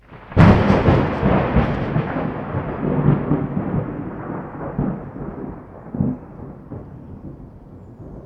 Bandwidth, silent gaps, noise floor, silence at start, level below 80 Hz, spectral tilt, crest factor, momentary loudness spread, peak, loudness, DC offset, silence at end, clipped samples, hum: 6.8 kHz; none; -40 dBFS; 0.1 s; -34 dBFS; -9.5 dB/octave; 20 dB; 22 LU; 0 dBFS; -20 LUFS; under 0.1%; 0 s; under 0.1%; none